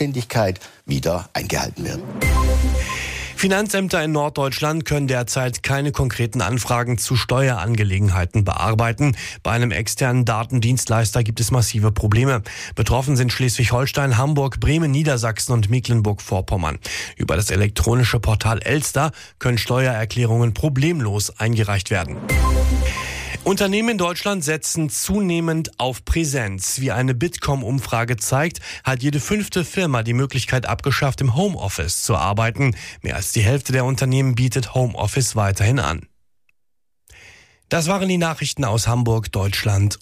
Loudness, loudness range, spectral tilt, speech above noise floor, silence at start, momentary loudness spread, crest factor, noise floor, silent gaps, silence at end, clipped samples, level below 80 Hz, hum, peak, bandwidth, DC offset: -20 LUFS; 2 LU; -5 dB/octave; 59 dB; 0 s; 5 LU; 12 dB; -78 dBFS; none; 0.05 s; under 0.1%; -30 dBFS; none; -8 dBFS; 15.5 kHz; under 0.1%